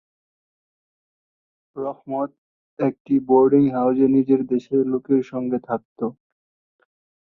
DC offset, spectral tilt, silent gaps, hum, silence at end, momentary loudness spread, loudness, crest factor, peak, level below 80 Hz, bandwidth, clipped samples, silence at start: under 0.1%; -10.5 dB/octave; 2.38-2.77 s, 3.00-3.05 s, 5.85-5.96 s; none; 1.1 s; 14 LU; -21 LUFS; 18 dB; -6 dBFS; -64 dBFS; 4.2 kHz; under 0.1%; 1.75 s